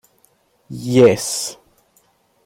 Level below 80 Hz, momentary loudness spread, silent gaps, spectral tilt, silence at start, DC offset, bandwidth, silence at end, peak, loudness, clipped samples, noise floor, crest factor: -58 dBFS; 17 LU; none; -5 dB/octave; 0.7 s; under 0.1%; 16.5 kHz; 0.95 s; -2 dBFS; -16 LUFS; under 0.1%; -59 dBFS; 18 dB